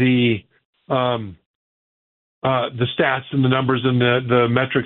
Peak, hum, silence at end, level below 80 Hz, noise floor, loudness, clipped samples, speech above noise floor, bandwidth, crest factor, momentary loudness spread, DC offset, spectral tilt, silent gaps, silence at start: -2 dBFS; none; 0 s; -58 dBFS; under -90 dBFS; -19 LUFS; under 0.1%; over 72 dB; 4.1 kHz; 18 dB; 8 LU; under 0.1%; -5 dB/octave; 0.65-0.73 s, 1.46-2.42 s; 0 s